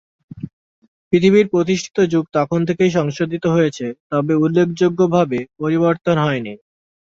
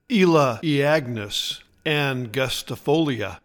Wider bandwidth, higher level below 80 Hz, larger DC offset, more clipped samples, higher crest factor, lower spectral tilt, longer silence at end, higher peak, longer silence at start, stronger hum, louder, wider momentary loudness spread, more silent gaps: second, 7.8 kHz vs 19 kHz; about the same, -56 dBFS vs -52 dBFS; neither; neither; about the same, 16 dB vs 16 dB; first, -7 dB/octave vs -5 dB/octave; first, 0.65 s vs 0.05 s; first, -2 dBFS vs -6 dBFS; first, 0.35 s vs 0.1 s; neither; first, -17 LUFS vs -22 LUFS; about the same, 10 LU vs 9 LU; first, 0.53-0.82 s, 0.88-1.11 s, 4.00-4.10 s vs none